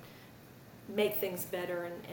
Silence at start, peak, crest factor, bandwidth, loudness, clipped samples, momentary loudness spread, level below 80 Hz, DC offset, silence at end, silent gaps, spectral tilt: 0 s; -18 dBFS; 20 dB; 17 kHz; -35 LUFS; under 0.1%; 22 LU; -70 dBFS; under 0.1%; 0 s; none; -4.5 dB/octave